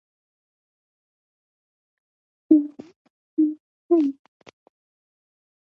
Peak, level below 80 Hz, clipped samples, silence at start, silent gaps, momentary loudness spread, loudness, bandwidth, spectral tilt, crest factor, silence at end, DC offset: -4 dBFS; -80 dBFS; under 0.1%; 2.5 s; 2.96-3.37 s, 3.60-3.89 s; 18 LU; -22 LUFS; 3.9 kHz; -8.5 dB/octave; 24 dB; 1.65 s; under 0.1%